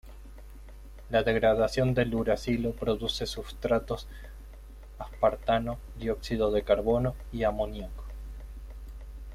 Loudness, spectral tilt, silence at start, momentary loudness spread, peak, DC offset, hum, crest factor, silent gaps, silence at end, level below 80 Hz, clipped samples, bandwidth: -29 LUFS; -6 dB/octave; 0.05 s; 24 LU; -10 dBFS; under 0.1%; none; 20 dB; none; 0 s; -42 dBFS; under 0.1%; 15.5 kHz